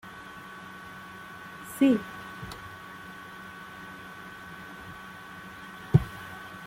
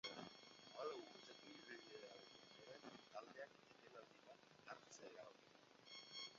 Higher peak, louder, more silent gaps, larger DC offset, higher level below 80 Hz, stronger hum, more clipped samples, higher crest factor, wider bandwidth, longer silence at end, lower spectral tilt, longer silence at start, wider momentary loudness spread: first, -6 dBFS vs -38 dBFS; first, -33 LUFS vs -59 LUFS; neither; neither; first, -54 dBFS vs under -90 dBFS; neither; neither; first, 28 dB vs 22 dB; first, 16.5 kHz vs 7.2 kHz; about the same, 0 s vs 0 s; first, -7 dB/octave vs -1 dB/octave; about the same, 0.05 s vs 0.05 s; first, 18 LU vs 12 LU